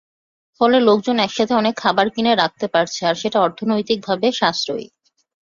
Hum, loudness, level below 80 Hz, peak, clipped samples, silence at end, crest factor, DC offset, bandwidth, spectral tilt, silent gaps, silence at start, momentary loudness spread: none; -18 LUFS; -60 dBFS; -2 dBFS; under 0.1%; 0.55 s; 18 dB; under 0.1%; 7.4 kHz; -4.5 dB/octave; none; 0.6 s; 6 LU